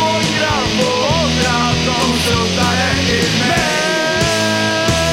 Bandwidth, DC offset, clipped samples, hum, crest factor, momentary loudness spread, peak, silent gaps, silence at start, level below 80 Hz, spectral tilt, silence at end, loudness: 16.5 kHz; 0.3%; under 0.1%; none; 14 dB; 1 LU; 0 dBFS; none; 0 s; -32 dBFS; -3.5 dB/octave; 0 s; -14 LUFS